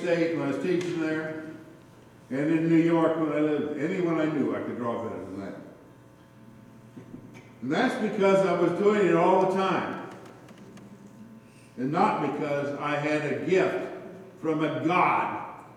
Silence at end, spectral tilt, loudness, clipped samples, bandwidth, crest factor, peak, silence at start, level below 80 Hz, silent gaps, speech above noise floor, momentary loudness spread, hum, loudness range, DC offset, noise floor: 0 s; -7 dB/octave; -26 LUFS; under 0.1%; 11.5 kHz; 18 dB; -10 dBFS; 0 s; -72 dBFS; none; 27 dB; 20 LU; none; 7 LU; under 0.1%; -52 dBFS